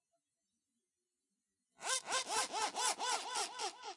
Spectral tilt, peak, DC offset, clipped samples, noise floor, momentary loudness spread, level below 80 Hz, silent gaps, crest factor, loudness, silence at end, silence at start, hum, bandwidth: 1.5 dB/octave; -20 dBFS; under 0.1%; under 0.1%; under -90 dBFS; 5 LU; under -90 dBFS; none; 22 dB; -37 LUFS; 0 s; 1.8 s; none; 11.5 kHz